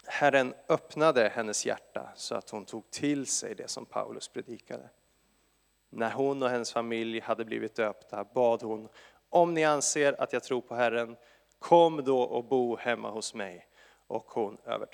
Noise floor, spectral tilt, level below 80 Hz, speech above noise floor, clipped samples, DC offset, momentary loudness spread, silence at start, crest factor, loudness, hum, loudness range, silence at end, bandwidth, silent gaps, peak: -71 dBFS; -3.5 dB/octave; -78 dBFS; 41 dB; under 0.1%; under 0.1%; 15 LU; 0.05 s; 24 dB; -30 LUFS; none; 8 LU; 0.1 s; 14.5 kHz; none; -8 dBFS